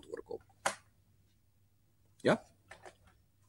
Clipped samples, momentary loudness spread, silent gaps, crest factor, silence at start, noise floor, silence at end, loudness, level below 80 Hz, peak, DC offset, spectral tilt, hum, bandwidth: under 0.1%; 23 LU; none; 26 dB; 0.1 s; -72 dBFS; 0.6 s; -36 LUFS; -74 dBFS; -16 dBFS; under 0.1%; -4.5 dB/octave; none; 16 kHz